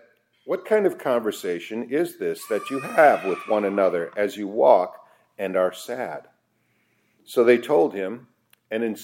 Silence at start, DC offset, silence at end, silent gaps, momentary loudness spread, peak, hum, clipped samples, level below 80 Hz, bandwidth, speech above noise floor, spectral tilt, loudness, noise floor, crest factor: 0.45 s; under 0.1%; 0 s; none; 13 LU; -2 dBFS; none; under 0.1%; -78 dBFS; 16.5 kHz; 46 dB; -5 dB/octave; -23 LUFS; -68 dBFS; 22 dB